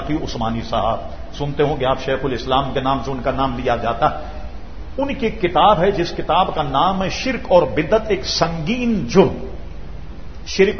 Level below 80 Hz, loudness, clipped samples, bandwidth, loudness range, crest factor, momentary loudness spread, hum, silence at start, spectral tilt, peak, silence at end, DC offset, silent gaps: -34 dBFS; -19 LUFS; under 0.1%; 6.6 kHz; 4 LU; 18 dB; 18 LU; none; 0 s; -5.5 dB/octave; 0 dBFS; 0 s; 3%; none